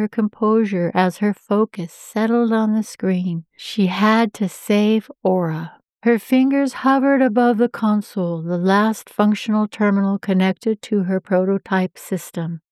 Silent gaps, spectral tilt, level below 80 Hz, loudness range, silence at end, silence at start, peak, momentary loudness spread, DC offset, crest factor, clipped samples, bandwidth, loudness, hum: none; -6.5 dB/octave; -74 dBFS; 2 LU; 0.15 s; 0 s; -4 dBFS; 9 LU; under 0.1%; 14 dB; under 0.1%; 14 kHz; -19 LUFS; none